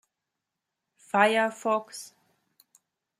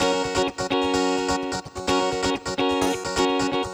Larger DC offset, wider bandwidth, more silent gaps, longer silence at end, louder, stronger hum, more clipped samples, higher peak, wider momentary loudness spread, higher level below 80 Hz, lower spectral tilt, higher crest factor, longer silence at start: neither; second, 15 kHz vs over 20 kHz; neither; first, 1.15 s vs 0 s; about the same, -25 LUFS vs -24 LUFS; neither; neither; about the same, -6 dBFS vs -8 dBFS; first, 20 LU vs 3 LU; second, -84 dBFS vs -46 dBFS; about the same, -3.5 dB/octave vs -3.5 dB/octave; first, 24 dB vs 16 dB; first, 1.15 s vs 0 s